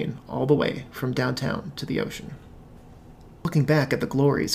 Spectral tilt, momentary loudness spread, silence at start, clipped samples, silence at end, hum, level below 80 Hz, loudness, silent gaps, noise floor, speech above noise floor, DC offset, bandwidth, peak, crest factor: -6 dB/octave; 11 LU; 0 s; under 0.1%; 0 s; none; -50 dBFS; -25 LUFS; none; -47 dBFS; 22 dB; under 0.1%; 16 kHz; -8 dBFS; 18 dB